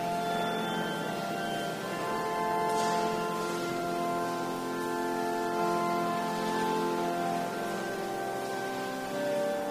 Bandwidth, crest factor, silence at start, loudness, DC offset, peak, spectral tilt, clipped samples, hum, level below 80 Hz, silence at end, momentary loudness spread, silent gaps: 15.5 kHz; 14 dB; 0 s; -32 LUFS; under 0.1%; -18 dBFS; -4.5 dB/octave; under 0.1%; none; -64 dBFS; 0 s; 5 LU; none